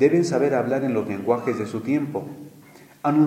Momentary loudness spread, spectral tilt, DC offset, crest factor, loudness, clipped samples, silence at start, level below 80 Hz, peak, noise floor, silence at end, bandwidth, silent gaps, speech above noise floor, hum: 14 LU; -7 dB/octave; under 0.1%; 16 dB; -23 LUFS; under 0.1%; 0 s; -70 dBFS; -6 dBFS; -48 dBFS; 0 s; 15 kHz; none; 26 dB; none